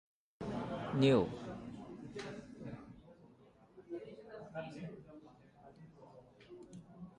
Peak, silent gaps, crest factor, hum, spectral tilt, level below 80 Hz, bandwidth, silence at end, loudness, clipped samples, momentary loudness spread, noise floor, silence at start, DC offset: -18 dBFS; none; 22 dB; none; -7 dB/octave; -66 dBFS; 10.5 kHz; 0.05 s; -39 LUFS; under 0.1%; 27 LU; -64 dBFS; 0.4 s; under 0.1%